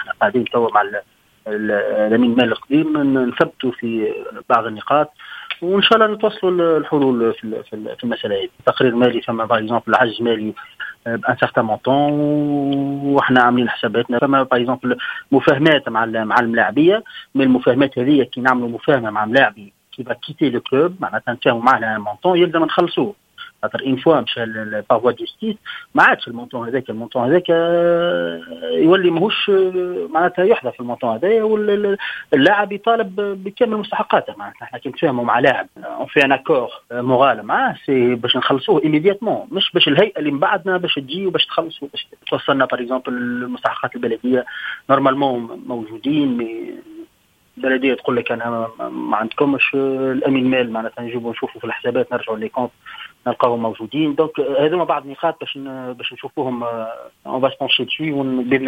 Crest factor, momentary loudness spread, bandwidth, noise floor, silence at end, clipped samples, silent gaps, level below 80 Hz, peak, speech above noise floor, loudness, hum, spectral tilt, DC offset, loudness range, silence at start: 18 dB; 12 LU; 9 kHz; -58 dBFS; 0 s; under 0.1%; none; -60 dBFS; 0 dBFS; 40 dB; -18 LUFS; none; -7 dB/octave; under 0.1%; 5 LU; 0 s